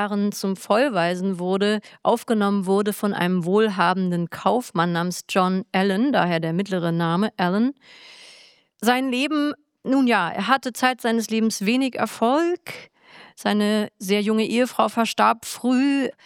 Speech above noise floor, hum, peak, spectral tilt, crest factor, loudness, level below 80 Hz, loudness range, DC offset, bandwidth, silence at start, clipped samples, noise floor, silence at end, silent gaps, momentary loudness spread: 31 dB; none; -2 dBFS; -5.5 dB/octave; 18 dB; -22 LUFS; -74 dBFS; 2 LU; under 0.1%; 17 kHz; 0 s; under 0.1%; -52 dBFS; 0.15 s; none; 5 LU